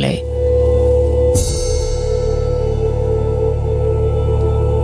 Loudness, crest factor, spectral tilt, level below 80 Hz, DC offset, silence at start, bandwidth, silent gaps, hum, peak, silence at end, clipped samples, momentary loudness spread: -16 LUFS; 12 dB; -6.5 dB/octave; -20 dBFS; under 0.1%; 0 s; 11 kHz; none; none; -2 dBFS; 0 s; under 0.1%; 5 LU